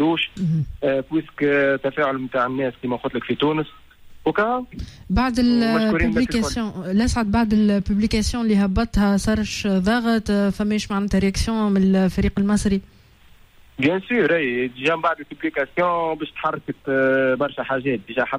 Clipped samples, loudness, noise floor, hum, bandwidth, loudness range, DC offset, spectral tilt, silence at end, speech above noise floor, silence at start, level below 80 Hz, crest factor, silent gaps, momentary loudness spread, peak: under 0.1%; -21 LUFS; -50 dBFS; none; 13 kHz; 3 LU; under 0.1%; -6 dB/octave; 0 s; 30 dB; 0 s; -36 dBFS; 14 dB; none; 7 LU; -8 dBFS